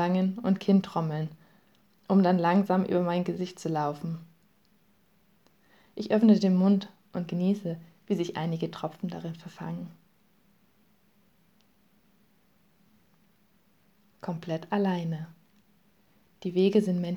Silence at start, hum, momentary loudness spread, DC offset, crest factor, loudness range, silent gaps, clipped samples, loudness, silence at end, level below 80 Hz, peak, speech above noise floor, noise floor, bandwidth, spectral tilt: 0 s; none; 16 LU; under 0.1%; 20 dB; 15 LU; none; under 0.1%; -28 LUFS; 0 s; -76 dBFS; -10 dBFS; 40 dB; -67 dBFS; 8.2 kHz; -8 dB/octave